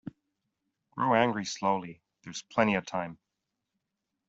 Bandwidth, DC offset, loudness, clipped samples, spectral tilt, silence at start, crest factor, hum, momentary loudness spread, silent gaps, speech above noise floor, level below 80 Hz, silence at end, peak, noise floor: 8 kHz; under 0.1%; -29 LUFS; under 0.1%; -5 dB/octave; 0.05 s; 24 dB; none; 20 LU; none; 56 dB; -70 dBFS; 1.15 s; -10 dBFS; -85 dBFS